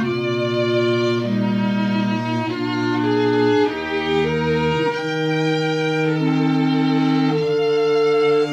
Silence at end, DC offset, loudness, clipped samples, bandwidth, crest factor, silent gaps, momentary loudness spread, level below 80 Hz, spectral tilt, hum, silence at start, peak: 0 s; under 0.1%; -19 LUFS; under 0.1%; 9.2 kHz; 12 dB; none; 4 LU; -52 dBFS; -7 dB/octave; none; 0 s; -8 dBFS